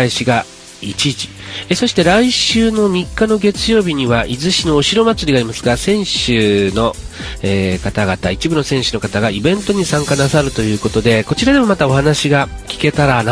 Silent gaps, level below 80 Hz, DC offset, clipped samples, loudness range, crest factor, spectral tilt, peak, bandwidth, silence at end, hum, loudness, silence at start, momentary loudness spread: none; -32 dBFS; under 0.1%; under 0.1%; 3 LU; 14 dB; -4.5 dB/octave; 0 dBFS; 11 kHz; 0 s; none; -14 LUFS; 0 s; 6 LU